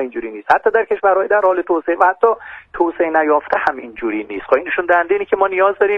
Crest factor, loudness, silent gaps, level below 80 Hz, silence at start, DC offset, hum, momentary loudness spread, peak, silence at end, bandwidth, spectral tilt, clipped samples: 16 dB; -16 LUFS; none; -52 dBFS; 0 s; under 0.1%; none; 10 LU; 0 dBFS; 0 s; 6.4 kHz; -6 dB/octave; under 0.1%